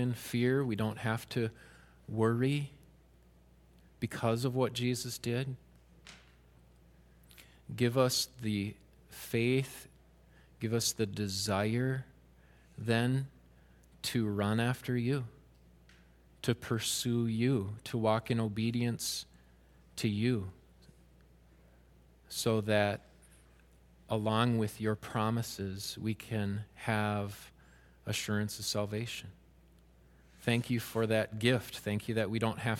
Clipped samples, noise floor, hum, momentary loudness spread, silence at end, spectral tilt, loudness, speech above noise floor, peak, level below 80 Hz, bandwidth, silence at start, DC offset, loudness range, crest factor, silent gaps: under 0.1%; -62 dBFS; none; 13 LU; 0 s; -5 dB/octave; -34 LUFS; 29 dB; -12 dBFS; -64 dBFS; 16.5 kHz; 0 s; under 0.1%; 3 LU; 24 dB; none